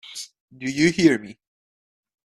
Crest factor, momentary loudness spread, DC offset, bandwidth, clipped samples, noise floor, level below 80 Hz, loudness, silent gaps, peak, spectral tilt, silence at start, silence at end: 22 dB; 19 LU; under 0.1%; 12.5 kHz; under 0.1%; under -90 dBFS; -60 dBFS; -21 LUFS; 0.40-0.48 s; -4 dBFS; -5 dB/octave; 0.1 s; 0.95 s